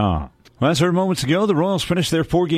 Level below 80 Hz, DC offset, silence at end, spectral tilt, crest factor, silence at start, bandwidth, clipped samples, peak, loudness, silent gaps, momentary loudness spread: -38 dBFS; under 0.1%; 0 s; -5.5 dB/octave; 14 dB; 0 s; 15 kHz; under 0.1%; -4 dBFS; -19 LUFS; none; 5 LU